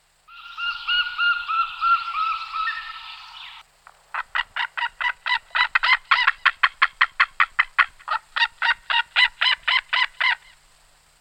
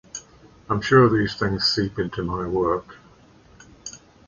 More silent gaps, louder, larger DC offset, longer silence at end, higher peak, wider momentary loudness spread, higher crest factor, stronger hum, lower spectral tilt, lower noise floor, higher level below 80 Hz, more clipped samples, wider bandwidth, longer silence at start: neither; about the same, -21 LUFS vs -21 LUFS; neither; first, 0.85 s vs 0.3 s; about the same, -2 dBFS vs -4 dBFS; second, 14 LU vs 22 LU; about the same, 22 dB vs 20 dB; neither; second, 2 dB/octave vs -5.5 dB/octave; first, -56 dBFS vs -52 dBFS; second, -56 dBFS vs -46 dBFS; neither; first, 13 kHz vs 7.4 kHz; first, 0.3 s vs 0.15 s